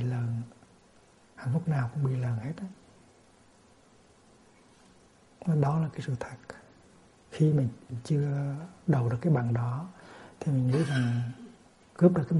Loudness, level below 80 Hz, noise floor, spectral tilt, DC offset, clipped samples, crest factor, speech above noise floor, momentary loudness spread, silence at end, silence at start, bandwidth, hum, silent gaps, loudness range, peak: -30 LUFS; -64 dBFS; -60 dBFS; -8.5 dB/octave; under 0.1%; under 0.1%; 20 dB; 32 dB; 21 LU; 0 s; 0 s; 11.5 kHz; none; none; 7 LU; -10 dBFS